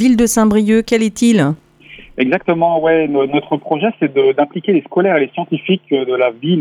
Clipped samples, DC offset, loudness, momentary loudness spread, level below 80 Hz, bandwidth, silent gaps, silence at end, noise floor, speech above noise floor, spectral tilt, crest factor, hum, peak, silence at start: under 0.1%; under 0.1%; -14 LUFS; 7 LU; -46 dBFS; 15.5 kHz; none; 0 s; -40 dBFS; 26 dB; -5.5 dB/octave; 12 dB; none; 0 dBFS; 0 s